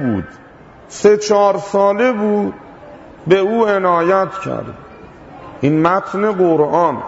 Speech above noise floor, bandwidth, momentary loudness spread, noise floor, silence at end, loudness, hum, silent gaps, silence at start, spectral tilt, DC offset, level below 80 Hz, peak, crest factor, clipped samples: 23 dB; 8 kHz; 18 LU; -37 dBFS; 0 s; -15 LUFS; none; none; 0 s; -6 dB/octave; under 0.1%; -52 dBFS; 0 dBFS; 14 dB; under 0.1%